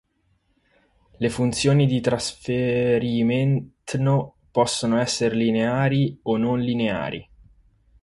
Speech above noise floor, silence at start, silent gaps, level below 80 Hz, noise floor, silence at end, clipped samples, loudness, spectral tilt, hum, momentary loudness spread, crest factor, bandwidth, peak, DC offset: 46 dB; 1.2 s; none; -52 dBFS; -67 dBFS; 0.8 s; under 0.1%; -22 LUFS; -6 dB/octave; none; 7 LU; 16 dB; 11.5 kHz; -6 dBFS; under 0.1%